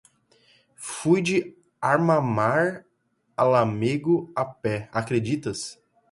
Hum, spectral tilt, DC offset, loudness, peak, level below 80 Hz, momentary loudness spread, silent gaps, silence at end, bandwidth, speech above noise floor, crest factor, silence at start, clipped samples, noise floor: none; -6 dB/octave; under 0.1%; -24 LUFS; -6 dBFS; -62 dBFS; 15 LU; none; 0.4 s; 11.5 kHz; 47 dB; 18 dB; 0.8 s; under 0.1%; -70 dBFS